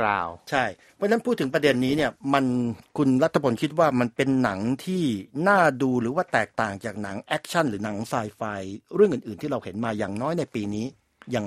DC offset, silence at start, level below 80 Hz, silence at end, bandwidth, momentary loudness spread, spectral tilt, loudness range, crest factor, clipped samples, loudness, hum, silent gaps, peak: under 0.1%; 0 s; -60 dBFS; 0 s; 14.5 kHz; 9 LU; -6 dB/octave; 4 LU; 20 dB; under 0.1%; -25 LUFS; none; none; -4 dBFS